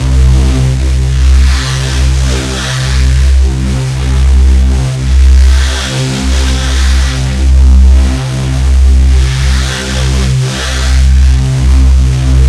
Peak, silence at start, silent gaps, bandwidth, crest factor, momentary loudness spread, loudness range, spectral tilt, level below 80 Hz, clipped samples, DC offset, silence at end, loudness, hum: 0 dBFS; 0 s; none; 11.5 kHz; 8 dB; 6 LU; 1 LU; -5 dB/octave; -8 dBFS; 0.4%; under 0.1%; 0 s; -10 LUFS; none